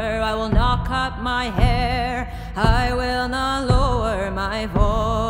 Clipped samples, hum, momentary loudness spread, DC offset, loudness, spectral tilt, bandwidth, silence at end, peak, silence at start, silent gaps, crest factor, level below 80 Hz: under 0.1%; none; 5 LU; under 0.1%; -21 LUFS; -6 dB/octave; 16 kHz; 0 s; -2 dBFS; 0 s; none; 18 dB; -24 dBFS